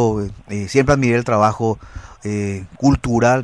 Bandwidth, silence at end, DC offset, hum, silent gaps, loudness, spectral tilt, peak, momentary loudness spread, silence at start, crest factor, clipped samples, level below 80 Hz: 11 kHz; 0 s; 0.2%; none; none; -18 LUFS; -6.5 dB/octave; -2 dBFS; 12 LU; 0 s; 16 dB; under 0.1%; -36 dBFS